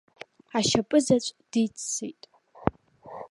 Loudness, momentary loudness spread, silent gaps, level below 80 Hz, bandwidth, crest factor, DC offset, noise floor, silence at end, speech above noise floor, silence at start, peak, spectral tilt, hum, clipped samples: -27 LUFS; 22 LU; none; -54 dBFS; 11.5 kHz; 24 dB; under 0.1%; -46 dBFS; 0.05 s; 20 dB; 0.55 s; -4 dBFS; -4 dB/octave; none; under 0.1%